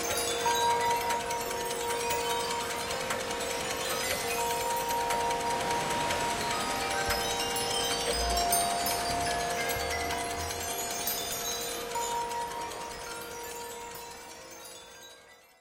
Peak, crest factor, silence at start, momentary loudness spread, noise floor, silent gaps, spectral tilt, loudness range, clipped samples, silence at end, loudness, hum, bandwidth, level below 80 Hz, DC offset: -12 dBFS; 20 dB; 0 s; 12 LU; -55 dBFS; none; -1.5 dB/octave; 7 LU; under 0.1%; 0.25 s; -30 LUFS; none; 17 kHz; -50 dBFS; under 0.1%